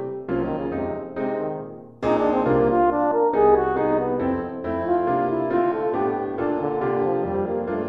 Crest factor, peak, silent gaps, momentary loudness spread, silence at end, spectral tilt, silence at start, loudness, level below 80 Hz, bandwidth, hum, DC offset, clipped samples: 16 dB; -6 dBFS; none; 9 LU; 0 s; -9.5 dB/octave; 0 s; -23 LUFS; -48 dBFS; 5.8 kHz; none; under 0.1%; under 0.1%